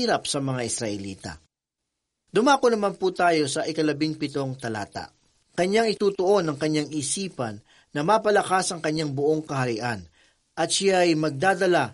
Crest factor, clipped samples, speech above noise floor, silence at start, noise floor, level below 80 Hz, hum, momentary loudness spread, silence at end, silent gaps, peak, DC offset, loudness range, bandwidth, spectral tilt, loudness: 18 dB; under 0.1%; 61 dB; 0 s; -84 dBFS; -62 dBFS; none; 14 LU; 0 s; none; -6 dBFS; under 0.1%; 2 LU; 11.5 kHz; -4 dB/octave; -24 LUFS